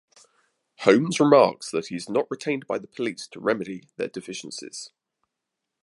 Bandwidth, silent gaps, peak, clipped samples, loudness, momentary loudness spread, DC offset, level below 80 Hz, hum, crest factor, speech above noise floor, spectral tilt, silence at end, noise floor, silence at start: 11.5 kHz; none; -2 dBFS; under 0.1%; -24 LUFS; 17 LU; under 0.1%; -72 dBFS; none; 24 dB; 60 dB; -5 dB/octave; 0.95 s; -83 dBFS; 0.8 s